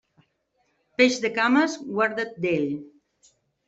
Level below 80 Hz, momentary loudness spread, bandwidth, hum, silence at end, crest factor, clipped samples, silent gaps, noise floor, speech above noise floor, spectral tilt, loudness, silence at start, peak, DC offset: -68 dBFS; 10 LU; 8.2 kHz; none; 0.8 s; 20 dB; under 0.1%; none; -71 dBFS; 48 dB; -4.5 dB/octave; -23 LUFS; 1 s; -4 dBFS; under 0.1%